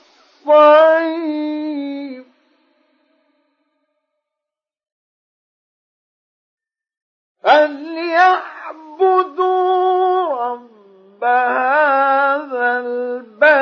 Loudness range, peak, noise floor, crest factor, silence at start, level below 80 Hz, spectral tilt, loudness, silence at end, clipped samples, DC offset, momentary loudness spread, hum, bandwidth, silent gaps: 12 LU; 0 dBFS; -86 dBFS; 18 dB; 0.45 s; -76 dBFS; -3.5 dB/octave; -15 LUFS; 0 s; under 0.1%; under 0.1%; 15 LU; none; 6.4 kHz; 4.92-6.57 s, 6.97-7.35 s